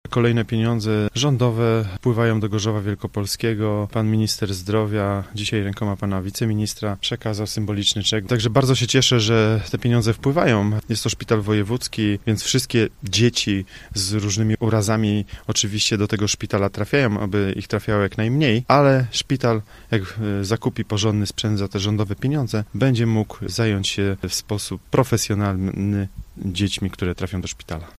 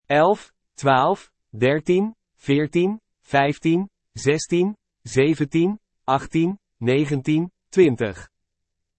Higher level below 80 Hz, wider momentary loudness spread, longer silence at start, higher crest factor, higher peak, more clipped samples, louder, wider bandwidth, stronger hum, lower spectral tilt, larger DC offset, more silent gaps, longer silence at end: first, -44 dBFS vs -56 dBFS; second, 7 LU vs 10 LU; about the same, 0.05 s vs 0.1 s; about the same, 20 dB vs 18 dB; first, 0 dBFS vs -4 dBFS; neither; about the same, -21 LUFS vs -21 LUFS; first, 15 kHz vs 8.8 kHz; neither; second, -5 dB/octave vs -6.5 dB/octave; neither; neither; second, 0.1 s vs 0.75 s